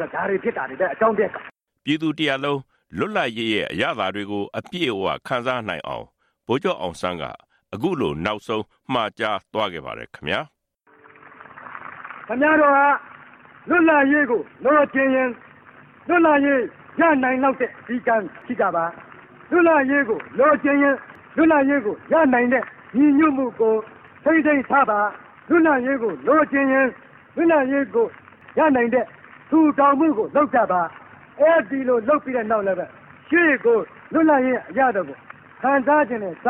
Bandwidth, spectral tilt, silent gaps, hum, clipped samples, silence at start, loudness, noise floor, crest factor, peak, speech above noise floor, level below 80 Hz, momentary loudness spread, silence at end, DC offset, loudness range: 9.8 kHz; -6.5 dB/octave; none; none; under 0.1%; 0 s; -20 LUFS; -57 dBFS; 16 dB; -4 dBFS; 38 dB; -60 dBFS; 12 LU; 0 s; under 0.1%; 7 LU